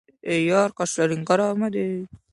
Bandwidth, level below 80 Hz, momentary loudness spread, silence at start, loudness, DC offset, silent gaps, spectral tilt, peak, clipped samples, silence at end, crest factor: 11.5 kHz; -64 dBFS; 7 LU; 0.25 s; -23 LUFS; under 0.1%; none; -5 dB/octave; -6 dBFS; under 0.1%; 0.15 s; 18 dB